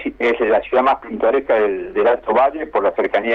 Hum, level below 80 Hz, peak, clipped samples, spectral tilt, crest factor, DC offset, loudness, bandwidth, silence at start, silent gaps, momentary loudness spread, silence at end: none; -48 dBFS; -4 dBFS; under 0.1%; -6.5 dB/octave; 12 dB; under 0.1%; -17 LUFS; 6.6 kHz; 0 s; none; 3 LU; 0 s